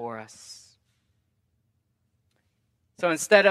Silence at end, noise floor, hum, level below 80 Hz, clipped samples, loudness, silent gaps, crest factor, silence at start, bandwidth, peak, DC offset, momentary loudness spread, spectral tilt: 0 s; -73 dBFS; none; -80 dBFS; under 0.1%; -23 LUFS; none; 26 dB; 0 s; 14.5 kHz; -2 dBFS; under 0.1%; 25 LU; -3 dB/octave